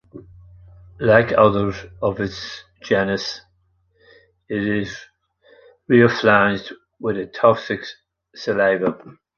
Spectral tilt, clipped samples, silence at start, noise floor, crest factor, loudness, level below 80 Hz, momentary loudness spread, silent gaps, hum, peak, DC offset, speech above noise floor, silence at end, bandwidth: -6.5 dB/octave; under 0.1%; 0.15 s; -63 dBFS; 18 dB; -19 LUFS; -50 dBFS; 17 LU; none; none; -2 dBFS; under 0.1%; 45 dB; 0.25 s; 7 kHz